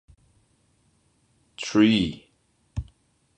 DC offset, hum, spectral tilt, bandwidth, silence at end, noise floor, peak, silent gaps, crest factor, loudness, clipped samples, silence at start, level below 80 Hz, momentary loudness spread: under 0.1%; none; -5.5 dB/octave; 9.2 kHz; 0.55 s; -67 dBFS; -6 dBFS; none; 22 dB; -24 LUFS; under 0.1%; 1.6 s; -48 dBFS; 24 LU